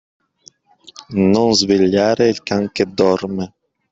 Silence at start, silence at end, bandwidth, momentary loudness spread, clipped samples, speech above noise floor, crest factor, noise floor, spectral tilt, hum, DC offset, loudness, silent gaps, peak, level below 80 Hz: 1.1 s; 0.45 s; 8 kHz; 11 LU; under 0.1%; 35 dB; 16 dB; -50 dBFS; -5 dB/octave; none; under 0.1%; -16 LUFS; none; -2 dBFS; -54 dBFS